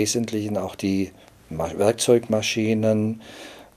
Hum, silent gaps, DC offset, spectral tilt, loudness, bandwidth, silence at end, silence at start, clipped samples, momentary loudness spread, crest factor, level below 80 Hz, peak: none; none; under 0.1%; -4.5 dB/octave; -23 LUFS; 15.5 kHz; 0.15 s; 0 s; under 0.1%; 15 LU; 18 dB; -54 dBFS; -6 dBFS